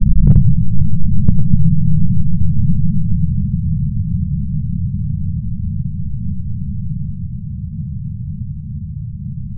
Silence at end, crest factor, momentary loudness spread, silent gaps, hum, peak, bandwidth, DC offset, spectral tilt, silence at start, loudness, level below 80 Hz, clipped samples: 0 s; 12 dB; 12 LU; none; none; 0 dBFS; 1.1 kHz; under 0.1%; -15 dB/octave; 0 s; -19 LUFS; -22 dBFS; under 0.1%